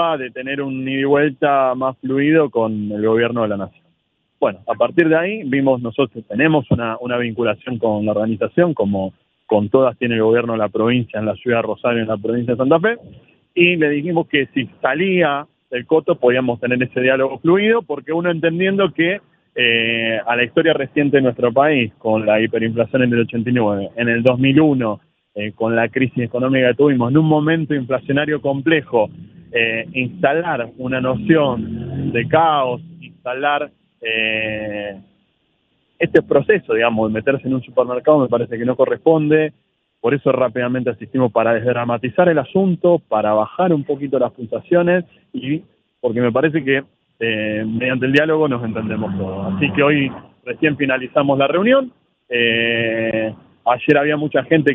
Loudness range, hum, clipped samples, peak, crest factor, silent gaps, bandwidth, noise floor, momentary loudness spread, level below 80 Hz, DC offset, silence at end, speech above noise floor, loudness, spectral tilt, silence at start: 3 LU; none; under 0.1%; 0 dBFS; 18 dB; none; 4.3 kHz; -67 dBFS; 9 LU; -56 dBFS; under 0.1%; 0 s; 50 dB; -17 LUFS; -9 dB/octave; 0 s